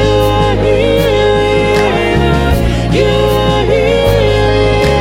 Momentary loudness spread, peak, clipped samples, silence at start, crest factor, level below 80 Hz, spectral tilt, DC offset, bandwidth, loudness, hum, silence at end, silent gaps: 1 LU; 0 dBFS; under 0.1%; 0 s; 10 dB; -20 dBFS; -6 dB/octave; under 0.1%; 16.5 kHz; -11 LUFS; none; 0 s; none